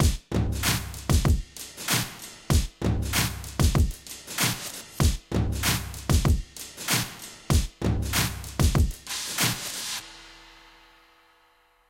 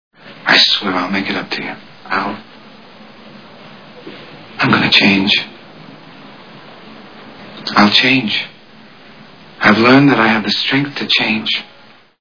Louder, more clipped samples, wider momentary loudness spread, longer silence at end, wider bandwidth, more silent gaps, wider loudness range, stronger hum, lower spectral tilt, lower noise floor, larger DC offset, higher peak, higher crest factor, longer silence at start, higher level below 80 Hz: second, -26 LUFS vs -12 LUFS; neither; second, 11 LU vs 22 LU; first, 1.45 s vs 0.55 s; first, 17 kHz vs 5.4 kHz; neither; second, 2 LU vs 9 LU; neither; about the same, -4 dB/octave vs -5 dB/octave; first, -62 dBFS vs -41 dBFS; second, under 0.1% vs 0.4%; second, -8 dBFS vs 0 dBFS; about the same, 18 dB vs 16 dB; second, 0 s vs 0.25 s; first, -32 dBFS vs -58 dBFS